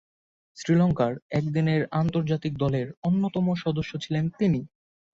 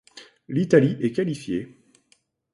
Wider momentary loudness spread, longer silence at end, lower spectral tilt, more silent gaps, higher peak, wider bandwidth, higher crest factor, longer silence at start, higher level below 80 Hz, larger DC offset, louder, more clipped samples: second, 6 LU vs 12 LU; second, 0.45 s vs 0.85 s; about the same, -8 dB/octave vs -7.5 dB/octave; first, 1.22-1.30 s, 2.97-3.02 s vs none; second, -12 dBFS vs -4 dBFS; second, 7.6 kHz vs 11.5 kHz; second, 14 dB vs 22 dB; first, 0.55 s vs 0.15 s; first, -54 dBFS vs -62 dBFS; neither; second, -26 LUFS vs -23 LUFS; neither